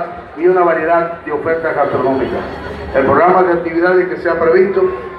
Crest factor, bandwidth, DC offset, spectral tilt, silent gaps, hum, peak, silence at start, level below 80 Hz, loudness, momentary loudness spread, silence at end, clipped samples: 14 dB; 5.4 kHz; under 0.1%; -8.5 dB/octave; none; none; 0 dBFS; 0 s; -42 dBFS; -13 LUFS; 9 LU; 0 s; under 0.1%